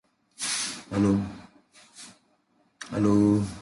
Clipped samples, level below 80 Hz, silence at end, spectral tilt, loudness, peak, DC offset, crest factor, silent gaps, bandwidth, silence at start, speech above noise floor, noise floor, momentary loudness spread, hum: under 0.1%; -52 dBFS; 0 s; -5 dB/octave; -26 LUFS; -10 dBFS; under 0.1%; 18 dB; none; 11.5 kHz; 0.4 s; 44 dB; -67 dBFS; 24 LU; none